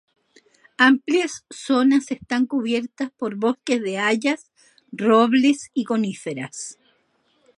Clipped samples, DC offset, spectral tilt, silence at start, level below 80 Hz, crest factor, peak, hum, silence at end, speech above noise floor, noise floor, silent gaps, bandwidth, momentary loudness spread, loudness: under 0.1%; under 0.1%; -4 dB/octave; 0.8 s; -70 dBFS; 20 dB; -2 dBFS; none; 0.85 s; 45 dB; -65 dBFS; none; 11 kHz; 14 LU; -21 LUFS